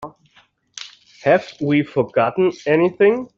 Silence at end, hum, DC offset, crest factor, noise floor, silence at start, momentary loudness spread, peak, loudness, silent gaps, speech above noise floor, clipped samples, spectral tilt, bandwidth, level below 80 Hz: 0.15 s; none; under 0.1%; 16 dB; -56 dBFS; 0 s; 20 LU; -2 dBFS; -18 LUFS; none; 39 dB; under 0.1%; -6.5 dB/octave; 7.6 kHz; -62 dBFS